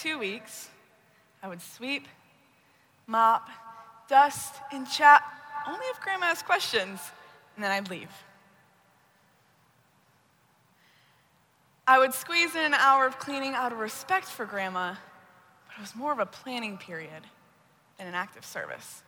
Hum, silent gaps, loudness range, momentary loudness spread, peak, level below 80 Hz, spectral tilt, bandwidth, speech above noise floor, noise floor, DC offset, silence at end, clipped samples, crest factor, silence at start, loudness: none; none; 13 LU; 22 LU; -6 dBFS; -78 dBFS; -2 dB/octave; over 20 kHz; 38 dB; -65 dBFS; under 0.1%; 0.1 s; under 0.1%; 24 dB; 0 s; -26 LUFS